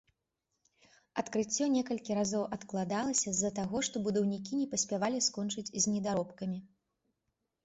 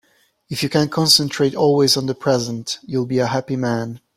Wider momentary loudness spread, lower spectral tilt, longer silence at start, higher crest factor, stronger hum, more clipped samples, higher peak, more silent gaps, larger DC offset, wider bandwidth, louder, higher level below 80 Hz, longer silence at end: second, 7 LU vs 11 LU; about the same, -3.5 dB/octave vs -4.5 dB/octave; first, 1.15 s vs 0.5 s; about the same, 20 dB vs 18 dB; neither; neither; second, -16 dBFS vs 0 dBFS; neither; neither; second, 8.4 kHz vs 16 kHz; second, -33 LUFS vs -18 LUFS; second, -70 dBFS vs -56 dBFS; first, 1 s vs 0.2 s